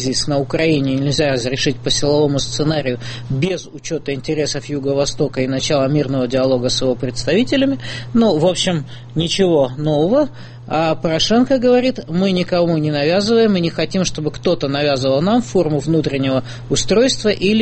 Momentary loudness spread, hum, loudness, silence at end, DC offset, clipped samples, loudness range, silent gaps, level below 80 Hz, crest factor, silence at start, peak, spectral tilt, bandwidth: 7 LU; none; -17 LUFS; 0 s; under 0.1%; under 0.1%; 3 LU; none; -40 dBFS; 14 dB; 0 s; -2 dBFS; -5 dB/octave; 8.8 kHz